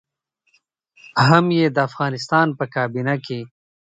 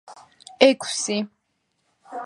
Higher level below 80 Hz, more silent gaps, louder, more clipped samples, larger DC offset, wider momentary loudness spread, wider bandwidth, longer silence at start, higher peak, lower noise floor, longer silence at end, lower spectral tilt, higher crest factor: first, -62 dBFS vs -72 dBFS; neither; about the same, -19 LUFS vs -21 LUFS; neither; neither; second, 13 LU vs 18 LU; second, 9.2 kHz vs 11.5 kHz; first, 1.15 s vs 0.1 s; about the same, 0 dBFS vs 0 dBFS; about the same, -70 dBFS vs -73 dBFS; first, 0.5 s vs 0 s; first, -6.5 dB/octave vs -2.5 dB/octave; about the same, 20 dB vs 24 dB